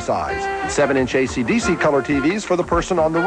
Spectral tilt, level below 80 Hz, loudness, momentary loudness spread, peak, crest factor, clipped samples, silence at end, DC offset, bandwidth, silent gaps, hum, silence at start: -5 dB/octave; -38 dBFS; -19 LUFS; 4 LU; -6 dBFS; 12 dB; under 0.1%; 0 s; under 0.1%; 10.5 kHz; none; none; 0 s